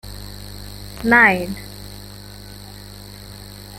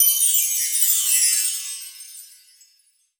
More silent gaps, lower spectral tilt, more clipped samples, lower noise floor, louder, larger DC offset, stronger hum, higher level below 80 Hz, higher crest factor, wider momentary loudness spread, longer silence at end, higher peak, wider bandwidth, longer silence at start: neither; first, -4.5 dB/octave vs 9.5 dB/octave; neither; second, -37 dBFS vs -62 dBFS; about the same, -15 LUFS vs -16 LUFS; neither; first, 50 Hz at -40 dBFS vs none; first, -42 dBFS vs -80 dBFS; about the same, 22 dB vs 20 dB; first, 25 LU vs 20 LU; second, 0 s vs 0.95 s; about the same, -2 dBFS vs -2 dBFS; second, 17 kHz vs over 20 kHz; about the same, 0.05 s vs 0 s